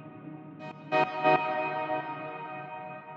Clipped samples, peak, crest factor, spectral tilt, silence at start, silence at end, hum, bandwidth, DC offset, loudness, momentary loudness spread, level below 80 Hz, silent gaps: under 0.1%; -12 dBFS; 20 dB; -7 dB/octave; 0 s; 0 s; none; 7.2 kHz; under 0.1%; -30 LUFS; 19 LU; -86 dBFS; none